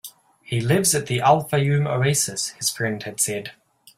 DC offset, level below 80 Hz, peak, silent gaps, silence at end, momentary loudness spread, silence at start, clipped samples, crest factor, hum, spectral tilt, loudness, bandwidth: under 0.1%; -56 dBFS; -4 dBFS; none; 0.45 s; 9 LU; 0.05 s; under 0.1%; 20 dB; none; -4 dB/octave; -21 LUFS; 16 kHz